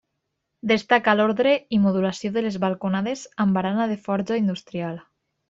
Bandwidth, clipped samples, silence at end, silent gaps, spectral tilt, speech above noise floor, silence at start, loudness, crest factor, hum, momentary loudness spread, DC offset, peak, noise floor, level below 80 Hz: 7.8 kHz; under 0.1%; 0.5 s; none; -6.5 dB/octave; 56 dB; 0.65 s; -23 LUFS; 20 dB; none; 11 LU; under 0.1%; -2 dBFS; -78 dBFS; -62 dBFS